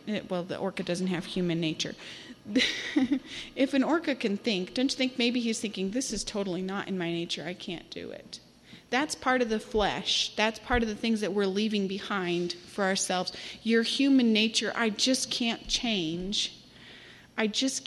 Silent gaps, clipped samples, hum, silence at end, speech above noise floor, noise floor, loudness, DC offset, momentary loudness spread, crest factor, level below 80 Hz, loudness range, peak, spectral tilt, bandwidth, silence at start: none; under 0.1%; none; 0 s; 22 dB; -51 dBFS; -29 LUFS; under 0.1%; 13 LU; 20 dB; -52 dBFS; 5 LU; -10 dBFS; -3.5 dB/octave; 13 kHz; 0.05 s